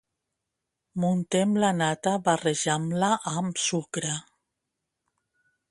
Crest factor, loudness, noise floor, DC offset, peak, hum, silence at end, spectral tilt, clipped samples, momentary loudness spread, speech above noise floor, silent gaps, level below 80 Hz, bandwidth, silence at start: 20 dB; -26 LUFS; -84 dBFS; under 0.1%; -8 dBFS; none; 1.5 s; -4.5 dB/octave; under 0.1%; 7 LU; 58 dB; none; -68 dBFS; 11.5 kHz; 0.95 s